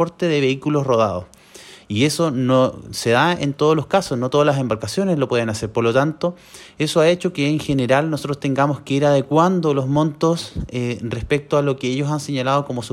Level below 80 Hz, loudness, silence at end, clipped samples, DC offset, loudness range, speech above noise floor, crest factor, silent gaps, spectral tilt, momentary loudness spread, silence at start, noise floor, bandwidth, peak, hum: -46 dBFS; -19 LUFS; 0.05 s; under 0.1%; under 0.1%; 2 LU; 24 dB; 16 dB; none; -6 dB/octave; 8 LU; 0 s; -43 dBFS; 16 kHz; -4 dBFS; none